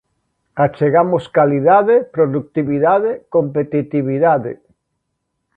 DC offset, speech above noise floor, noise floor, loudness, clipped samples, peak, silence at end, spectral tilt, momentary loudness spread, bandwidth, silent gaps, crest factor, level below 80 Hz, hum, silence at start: under 0.1%; 58 dB; -73 dBFS; -15 LUFS; under 0.1%; 0 dBFS; 1 s; -10 dB/octave; 8 LU; 4.6 kHz; none; 16 dB; -58 dBFS; none; 0.55 s